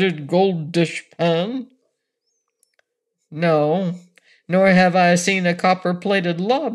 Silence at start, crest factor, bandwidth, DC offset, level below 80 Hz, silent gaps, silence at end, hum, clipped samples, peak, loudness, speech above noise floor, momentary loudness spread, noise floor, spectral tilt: 0 s; 16 dB; 12 kHz; under 0.1%; -66 dBFS; none; 0 s; none; under 0.1%; -4 dBFS; -18 LUFS; 58 dB; 10 LU; -76 dBFS; -5.5 dB/octave